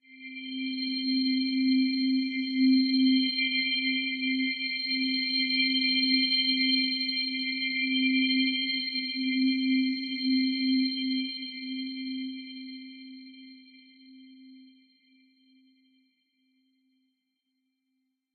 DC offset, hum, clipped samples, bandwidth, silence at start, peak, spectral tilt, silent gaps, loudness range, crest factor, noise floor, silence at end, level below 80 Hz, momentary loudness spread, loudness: under 0.1%; none; under 0.1%; 4.7 kHz; 0.1 s; -12 dBFS; -3.5 dB/octave; none; 14 LU; 16 dB; -80 dBFS; 3.7 s; under -90 dBFS; 13 LU; -26 LUFS